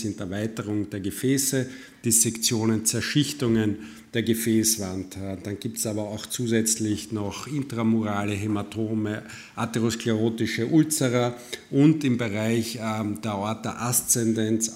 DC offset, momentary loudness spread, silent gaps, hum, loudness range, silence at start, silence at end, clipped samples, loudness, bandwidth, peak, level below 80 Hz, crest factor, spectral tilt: under 0.1%; 10 LU; none; none; 3 LU; 0 s; 0 s; under 0.1%; -25 LUFS; 16 kHz; -6 dBFS; -60 dBFS; 20 dB; -4 dB/octave